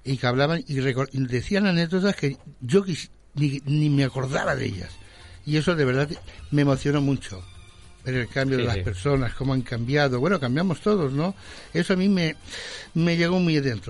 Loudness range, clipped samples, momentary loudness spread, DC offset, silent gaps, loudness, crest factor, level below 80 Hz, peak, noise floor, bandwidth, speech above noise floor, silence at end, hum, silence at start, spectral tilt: 2 LU; under 0.1%; 11 LU; under 0.1%; none; -24 LUFS; 18 dB; -46 dBFS; -6 dBFS; -46 dBFS; 11.5 kHz; 23 dB; 0 s; none; 0.05 s; -6.5 dB/octave